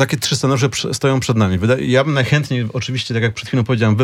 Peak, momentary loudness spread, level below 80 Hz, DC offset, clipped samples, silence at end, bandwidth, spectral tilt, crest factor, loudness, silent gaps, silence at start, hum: -2 dBFS; 5 LU; -52 dBFS; under 0.1%; under 0.1%; 0 s; 16 kHz; -5.5 dB/octave; 14 dB; -17 LUFS; none; 0 s; none